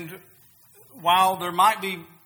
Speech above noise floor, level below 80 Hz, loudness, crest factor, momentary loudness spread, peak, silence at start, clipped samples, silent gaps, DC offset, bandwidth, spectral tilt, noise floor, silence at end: 32 dB; -72 dBFS; -21 LUFS; 18 dB; 12 LU; -6 dBFS; 0 s; under 0.1%; none; under 0.1%; over 20 kHz; -2.5 dB/octave; -54 dBFS; 0.2 s